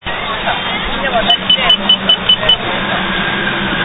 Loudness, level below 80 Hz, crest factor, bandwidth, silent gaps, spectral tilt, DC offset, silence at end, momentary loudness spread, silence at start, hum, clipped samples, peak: -12 LUFS; -34 dBFS; 14 dB; 8 kHz; none; -5.5 dB/octave; under 0.1%; 0 s; 8 LU; 0.05 s; none; under 0.1%; 0 dBFS